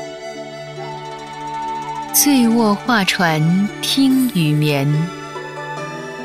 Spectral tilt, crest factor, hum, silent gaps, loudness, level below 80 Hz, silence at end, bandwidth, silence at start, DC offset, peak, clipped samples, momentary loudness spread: -4.5 dB/octave; 18 dB; none; none; -16 LUFS; -54 dBFS; 0 s; 16 kHz; 0 s; under 0.1%; 0 dBFS; under 0.1%; 16 LU